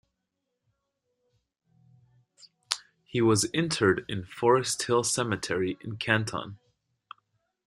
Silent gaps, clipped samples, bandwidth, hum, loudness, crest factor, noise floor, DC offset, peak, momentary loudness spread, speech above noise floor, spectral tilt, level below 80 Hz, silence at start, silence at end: none; under 0.1%; 14 kHz; none; -27 LUFS; 28 dB; -82 dBFS; under 0.1%; -2 dBFS; 10 LU; 56 dB; -4 dB/octave; -64 dBFS; 2.7 s; 1.15 s